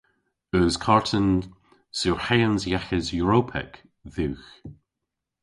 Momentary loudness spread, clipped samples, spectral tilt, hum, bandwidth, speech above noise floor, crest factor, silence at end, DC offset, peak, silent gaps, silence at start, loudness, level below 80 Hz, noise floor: 17 LU; under 0.1%; -5.5 dB/octave; none; 11.5 kHz; 60 dB; 22 dB; 0.7 s; under 0.1%; -4 dBFS; none; 0.55 s; -24 LUFS; -44 dBFS; -84 dBFS